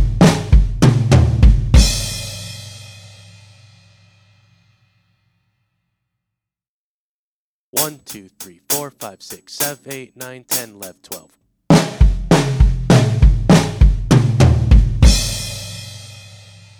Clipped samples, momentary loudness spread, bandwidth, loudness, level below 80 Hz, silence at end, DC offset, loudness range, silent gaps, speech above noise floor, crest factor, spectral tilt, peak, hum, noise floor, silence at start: under 0.1%; 21 LU; over 20 kHz; -15 LUFS; -20 dBFS; 0.65 s; under 0.1%; 14 LU; 6.68-7.73 s; over 63 dB; 16 dB; -5.5 dB/octave; 0 dBFS; none; under -90 dBFS; 0 s